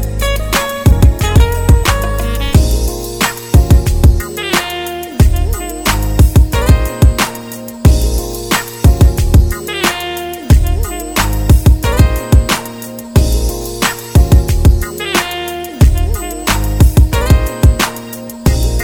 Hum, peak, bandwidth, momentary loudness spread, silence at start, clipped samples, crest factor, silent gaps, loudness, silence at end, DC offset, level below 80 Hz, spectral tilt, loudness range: none; 0 dBFS; 18 kHz; 9 LU; 0 s; 0.6%; 10 dB; none; -13 LUFS; 0 s; under 0.1%; -14 dBFS; -5 dB/octave; 1 LU